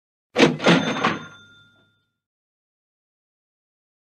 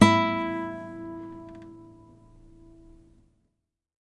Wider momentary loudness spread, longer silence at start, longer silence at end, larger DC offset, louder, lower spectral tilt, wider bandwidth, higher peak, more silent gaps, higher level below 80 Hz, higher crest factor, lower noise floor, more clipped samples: second, 12 LU vs 25 LU; first, 0.35 s vs 0 s; first, 2.8 s vs 2.2 s; neither; first, -19 LUFS vs -28 LUFS; about the same, -5 dB/octave vs -5.5 dB/octave; about the same, 10.5 kHz vs 11.5 kHz; about the same, -2 dBFS vs -2 dBFS; neither; second, -68 dBFS vs -58 dBFS; about the same, 24 dB vs 28 dB; second, -64 dBFS vs -78 dBFS; neither